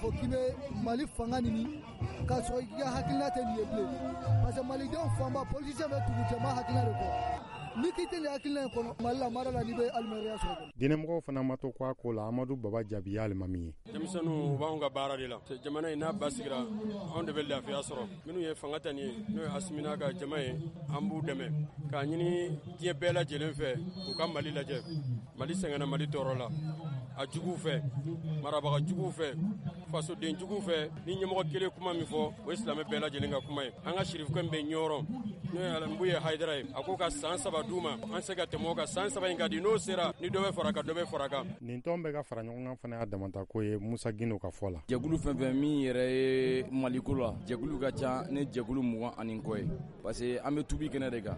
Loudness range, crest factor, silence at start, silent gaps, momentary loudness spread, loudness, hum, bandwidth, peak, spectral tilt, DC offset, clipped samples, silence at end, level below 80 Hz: 4 LU; 18 dB; 0 s; none; 7 LU; -35 LUFS; none; 11.5 kHz; -18 dBFS; -6 dB/octave; under 0.1%; under 0.1%; 0 s; -52 dBFS